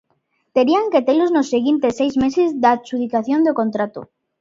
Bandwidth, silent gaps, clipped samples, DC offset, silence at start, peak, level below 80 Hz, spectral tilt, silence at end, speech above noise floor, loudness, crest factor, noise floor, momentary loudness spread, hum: 7.6 kHz; none; under 0.1%; under 0.1%; 0.55 s; -2 dBFS; -56 dBFS; -5.5 dB/octave; 0.35 s; 50 dB; -18 LUFS; 16 dB; -67 dBFS; 6 LU; none